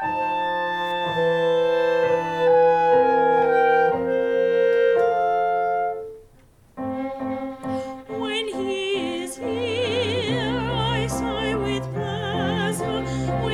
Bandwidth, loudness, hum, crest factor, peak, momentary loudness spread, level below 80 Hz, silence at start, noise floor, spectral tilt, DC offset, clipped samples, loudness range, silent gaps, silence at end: 13.5 kHz; -22 LUFS; none; 14 dB; -8 dBFS; 11 LU; -46 dBFS; 0 s; -53 dBFS; -5.5 dB/octave; under 0.1%; under 0.1%; 9 LU; none; 0 s